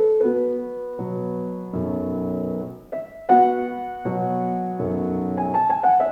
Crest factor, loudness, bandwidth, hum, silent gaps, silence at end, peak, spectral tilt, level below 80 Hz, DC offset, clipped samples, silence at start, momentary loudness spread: 18 dB; -23 LUFS; 5.4 kHz; none; none; 0 s; -4 dBFS; -10 dB/octave; -56 dBFS; under 0.1%; under 0.1%; 0 s; 12 LU